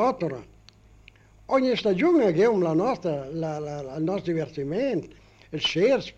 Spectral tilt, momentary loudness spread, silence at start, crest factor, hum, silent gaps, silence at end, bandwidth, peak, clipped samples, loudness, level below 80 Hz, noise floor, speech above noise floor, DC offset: -6 dB/octave; 11 LU; 0 s; 14 dB; none; none; 0.05 s; 8.4 kHz; -10 dBFS; under 0.1%; -25 LUFS; -56 dBFS; -53 dBFS; 29 dB; under 0.1%